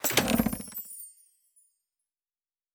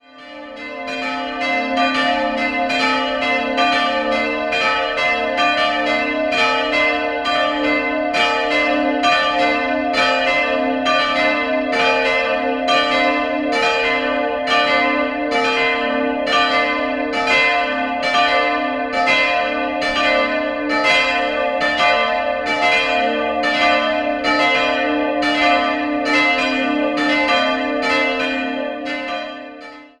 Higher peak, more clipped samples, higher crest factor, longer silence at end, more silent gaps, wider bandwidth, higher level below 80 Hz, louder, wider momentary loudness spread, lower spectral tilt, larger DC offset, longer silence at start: second, -6 dBFS vs -2 dBFS; neither; first, 26 dB vs 16 dB; first, 1.65 s vs 0.15 s; neither; first, over 20 kHz vs 11 kHz; about the same, -52 dBFS vs -48 dBFS; second, -29 LUFS vs -17 LUFS; first, 19 LU vs 5 LU; about the same, -3 dB/octave vs -3 dB/octave; neither; second, 0 s vs 0.15 s